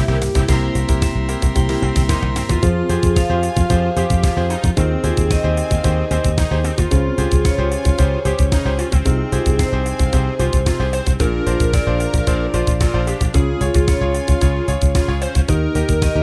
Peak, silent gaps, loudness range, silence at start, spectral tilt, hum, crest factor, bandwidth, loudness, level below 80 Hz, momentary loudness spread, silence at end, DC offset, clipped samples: -2 dBFS; none; 1 LU; 0 s; -6 dB/octave; none; 14 dB; 11 kHz; -17 LUFS; -20 dBFS; 2 LU; 0 s; 0.1%; under 0.1%